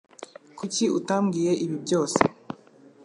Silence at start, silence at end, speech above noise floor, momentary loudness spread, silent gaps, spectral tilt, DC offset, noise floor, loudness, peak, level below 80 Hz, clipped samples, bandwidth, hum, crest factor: 0.2 s; 0.5 s; 29 dB; 19 LU; none; -5 dB/octave; under 0.1%; -53 dBFS; -25 LUFS; -2 dBFS; -62 dBFS; under 0.1%; 11.5 kHz; none; 24 dB